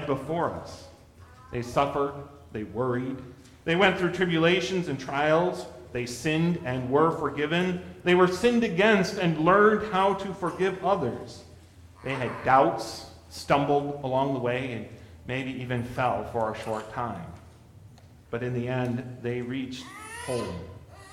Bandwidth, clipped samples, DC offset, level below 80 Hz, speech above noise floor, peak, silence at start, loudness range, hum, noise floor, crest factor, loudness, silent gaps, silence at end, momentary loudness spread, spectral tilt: 15 kHz; under 0.1%; under 0.1%; -56 dBFS; 25 dB; -6 dBFS; 0 s; 10 LU; none; -51 dBFS; 20 dB; -26 LUFS; none; 0 s; 18 LU; -6 dB/octave